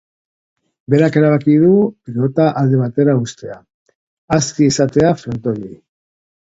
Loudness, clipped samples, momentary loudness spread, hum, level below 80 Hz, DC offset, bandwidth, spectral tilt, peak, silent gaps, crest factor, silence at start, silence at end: -14 LUFS; under 0.1%; 12 LU; none; -50 dBFS; under 0.1%; 8 kHz; -6.5 dB/octave; 0 dBFS; 3.74-3.86 s, 3.95-4.28 s; 16 dB; 0.9 s; 0.75 s